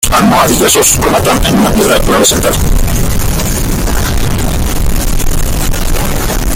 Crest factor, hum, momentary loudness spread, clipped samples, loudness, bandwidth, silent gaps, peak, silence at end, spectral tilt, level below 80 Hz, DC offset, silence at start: 8 dB; none; 8 LU; under 0.1%; -10 LUFS; 17.5 kHz; none; 0 dBFS; 0 s; -4 dB/octave; -14 dBFS; under 0.1%; 0 s